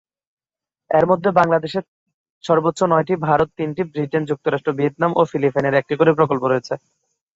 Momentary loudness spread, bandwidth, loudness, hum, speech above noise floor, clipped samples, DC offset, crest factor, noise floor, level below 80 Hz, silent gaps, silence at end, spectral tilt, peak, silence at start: 8 LU; 8 kHz; -19 LUFS; none; 71 dB; under 0.1%; under 0.1%; 18 dB; -89 dBFS; -56 dBFS; 1.88-2.06 s, 2.14-2.41 s; 0.6 s; -7 dB/octave; -2 dBFS; 0.9 s